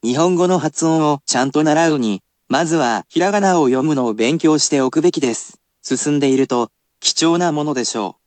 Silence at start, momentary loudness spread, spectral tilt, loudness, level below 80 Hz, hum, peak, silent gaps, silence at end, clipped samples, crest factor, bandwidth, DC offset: 0.05 s; 7 LU; -4 dB/octave; -16 LUFS; -68 dBFS; none; -2 dBFS; none; 0.15 s; under 0.1%; 14 dB; 9.2 kHz; under 0.1%